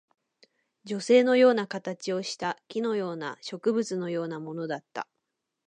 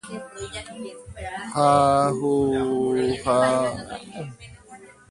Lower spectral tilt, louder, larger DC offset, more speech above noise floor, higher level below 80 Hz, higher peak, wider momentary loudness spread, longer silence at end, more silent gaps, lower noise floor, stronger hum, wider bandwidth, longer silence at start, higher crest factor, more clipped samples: about the same, -5 dB/octave vs -5.5 dB/octave; second, -27 LUFS vs -21 LUFS; neither; first, 55 dB vs 24 dB; second, -82 dBFS vs -50 dBFS; second, -10 dBFS vs -4 dBFS; second, 15 LU vs 19 LU; first, 0.65 s vs 0.2 s; neither; first, -82 dBFS vs -47 dBFS; neither; second, 9.6 kHz vs 11.5 kHz; first, 0.85 s vs 0.05 s; about the same, 18 dB vs 20 dB; neither